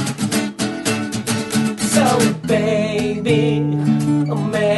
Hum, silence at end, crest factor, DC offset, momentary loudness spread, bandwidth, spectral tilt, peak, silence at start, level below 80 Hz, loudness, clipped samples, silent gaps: none; 0 s; 16 dB; under 0.1%; 6 LU; 12.5 kHz; -5 dB/octave; -2 dBFS; 0 s; -50 dBFS; -18 LUFS; under 0.1%; none